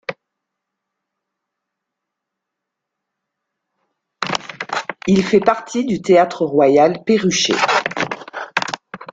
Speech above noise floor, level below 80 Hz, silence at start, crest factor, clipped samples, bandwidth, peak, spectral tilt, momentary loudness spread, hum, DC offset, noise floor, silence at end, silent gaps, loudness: 66 dB; -58 dBFS; 0.1 s; 18 dB; under 0.1%; 9 kHz; 0 dBFS; -4.5 dB/octave; 11 LU; none; under 0.1%; -80 dBFS; 0.05 s; none; -17 LUFS